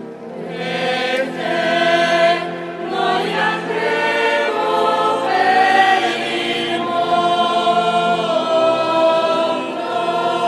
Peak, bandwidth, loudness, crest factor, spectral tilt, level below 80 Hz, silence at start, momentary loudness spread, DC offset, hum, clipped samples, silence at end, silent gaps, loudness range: -2 dBFS; 12.5 kHz; -17 LUFS; 14 dB; -4 dB/octave; -66 dBFS; 0 s; 7 LU; under 0.1%; none; under 0.1%; 0 s; none; 2 LU